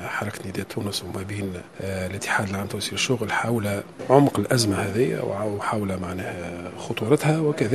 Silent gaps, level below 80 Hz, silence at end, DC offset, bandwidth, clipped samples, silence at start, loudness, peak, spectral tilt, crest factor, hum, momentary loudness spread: none; -58 dBFS; 0 s; 0.1%; 13.5 kHz; under 0.1%; 0 s; -25 LUFS; -2 dBFS; -5 dB/octave; 24 dB; none; 12 LU